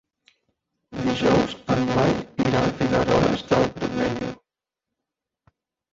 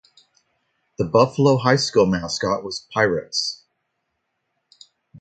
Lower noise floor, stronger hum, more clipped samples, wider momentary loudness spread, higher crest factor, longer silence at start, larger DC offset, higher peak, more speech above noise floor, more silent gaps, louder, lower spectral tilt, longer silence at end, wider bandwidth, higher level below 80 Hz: first, -86 dBFS vs -75 dBFS; neither; neither; second, 7 LU vs 10 LU; about the same, 18 dB vs 22 dB; about the same, 0.9 s vs 1 s; neither; second, -6 dBFS vs 0 dBFS; first, 65 dB vs 56 dB; neither; about the same, -22 LUFS vs -20 LUFS; first, -6.5 dB/octave vs -5 dB/octave; first, 1.6 s vs 0 s; second, 7.8 kHz vs 9.2 kHz; first, -46 dBFS vs -52 dBFS